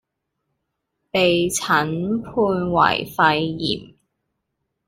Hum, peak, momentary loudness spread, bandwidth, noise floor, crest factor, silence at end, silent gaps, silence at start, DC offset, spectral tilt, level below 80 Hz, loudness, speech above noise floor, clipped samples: none; -2 dBFS; 7 LU; 16 kHz; -77 dBFS; 20 dB; 1 s; none; 1.15 s; under 0.1%; -4 dB/octave; -52 dBFS; -20 LUFS; 57 dB; under 0.1%